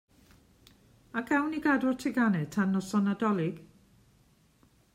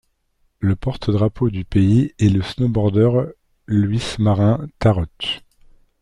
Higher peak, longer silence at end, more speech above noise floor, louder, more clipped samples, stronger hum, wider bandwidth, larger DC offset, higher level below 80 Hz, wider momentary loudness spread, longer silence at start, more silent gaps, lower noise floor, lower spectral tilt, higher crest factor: second, -14 dBFS vs -2 dBFS; first, 1.3 s vs 0.65 s; second, 36 dB vs 47 dB; second, -29 LUFS vs -19 LUFS; neither; neither; first, 14.5 kHz vs 10.5 kHz; neither; second, -66 dBFS vs -40 dBFS; about the same, 9 LU vs 8 LU; first, 1.15 s vs 0.6 s; neither; about the same, -64 dBFS vs -64 dBFS; about the same, -6.5 dB/octave vs -7.5 dB/octave; about the same, 18 dB vs 16 dB